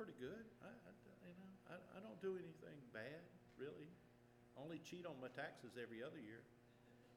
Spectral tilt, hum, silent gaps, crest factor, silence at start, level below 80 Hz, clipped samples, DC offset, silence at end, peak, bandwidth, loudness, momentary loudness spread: -6 dB/octave; none; none; 18 dB; 0 s; -84 dBFS; under 0.1%; under 0.1%; 0 s; -38 dBFS; 14.5 kHz; -56 LUFS; 12 LU